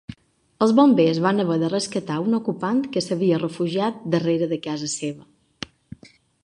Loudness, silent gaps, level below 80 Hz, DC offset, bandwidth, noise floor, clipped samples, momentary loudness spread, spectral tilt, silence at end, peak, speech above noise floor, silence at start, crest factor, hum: -22 LUFS; none; -62 dBFS; under 0.1%; 11 kHz; -52 dBFS; under 0.1%; 19 LU; -6 dB/octave; 1.2 s; -4 dBFS; 31 dB; 0.1 s; 18 dB; none